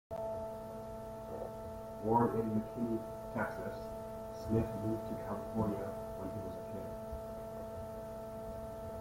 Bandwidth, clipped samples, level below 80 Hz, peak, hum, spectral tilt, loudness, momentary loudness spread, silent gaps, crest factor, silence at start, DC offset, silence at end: 16.5 kHz; under 0.1%; -56 dBFS; -18 dBFS; none; -8 dB/octave; -40 LUFS; 11 LU; none; 20 dB; 0.1 s; under 0.1%; 0 s